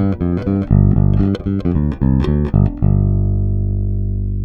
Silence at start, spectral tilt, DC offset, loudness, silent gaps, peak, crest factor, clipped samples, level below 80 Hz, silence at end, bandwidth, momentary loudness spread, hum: 0 s; -11 dB/octave; under 0.1%; -16 LUFS; none; 0 dBFS; 14 dB; under 0.1%; -22 dBFS; 0 s; 4.5 kHz; 6 LU; 50 Hz at -30 dBFS